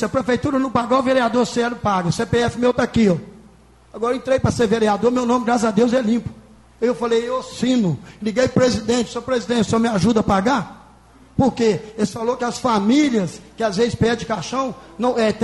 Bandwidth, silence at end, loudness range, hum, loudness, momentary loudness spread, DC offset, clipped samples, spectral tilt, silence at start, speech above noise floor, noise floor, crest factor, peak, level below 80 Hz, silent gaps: 11.5 kHz; 0 s; 1 LU; none; -19 LUFS; 7 LU; under 0.1%; under 0.1%; -5.5 dB/octave; 0 s; 30 dB; -48 dBFS; 16 dB; -4 dBFS; -44 dBFS; none